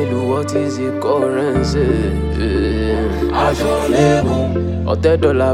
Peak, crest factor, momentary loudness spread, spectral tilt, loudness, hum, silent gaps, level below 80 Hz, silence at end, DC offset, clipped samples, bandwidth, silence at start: 0 dBFS; 14 dB; 5 LU; -6.5 dB/octave; -16 LUFS; none; none; -28 dBFS; 0 s; under 0.1%; under 0.1%; 15 kHz; 0 s